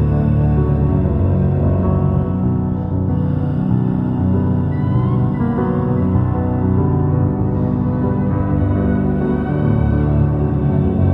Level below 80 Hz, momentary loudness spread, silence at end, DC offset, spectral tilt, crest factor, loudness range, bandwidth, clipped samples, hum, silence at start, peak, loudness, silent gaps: -26 dBFS; 2 LU; 0 s; under 0.1%; -12.5 dB/octave; 12 dB; 1 LU; 3.9 kHz; under 0.1%; none; 0 s; -4 dBFS; -17 LUFS; none